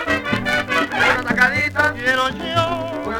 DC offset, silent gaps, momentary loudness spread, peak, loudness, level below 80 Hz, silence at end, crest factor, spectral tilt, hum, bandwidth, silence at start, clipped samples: under 0.1%; none; 4 LU; 0 dBFS; -18 LUFS; -44 dBFS; 0 s; 20 dB; -4.5 dB/octave; none; over 20 kHz; 0 s; under 0.1%